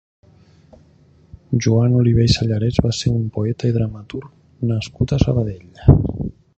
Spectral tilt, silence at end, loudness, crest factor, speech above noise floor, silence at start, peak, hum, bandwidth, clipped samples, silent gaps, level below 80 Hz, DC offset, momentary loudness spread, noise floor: -7 dB/octave; 0.25 s; -18 LUFS; 18 dB; 34 dB; 1.5 s; 0 dBFS; none; 8.2 kHz; under 0.1%; none; -32 dBFS; under 0.1%; 11 LU; -51 dBFS